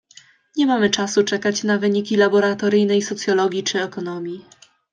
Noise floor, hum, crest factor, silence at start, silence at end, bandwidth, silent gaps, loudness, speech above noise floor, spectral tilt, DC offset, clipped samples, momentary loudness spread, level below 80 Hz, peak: -50 dBFS; none; 16 dB; 0.55 s; 0.5 s; 9.6 kHz; none; -19 LUFS; 31 dB; -4 dB/octave; under 0.1%; under 0.1%; 11 LU; -68 dBFS; -4 dBFS